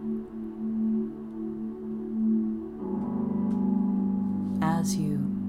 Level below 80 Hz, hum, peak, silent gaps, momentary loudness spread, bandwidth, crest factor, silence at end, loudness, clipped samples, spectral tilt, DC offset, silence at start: -58 dBFS; none; -14 dBFS; none; 9 LU; 14.5 kHz; 14 dB; 0 s; -29 LUFS; under 0.1%; -7 dB/octave; under 0.1%; 0 s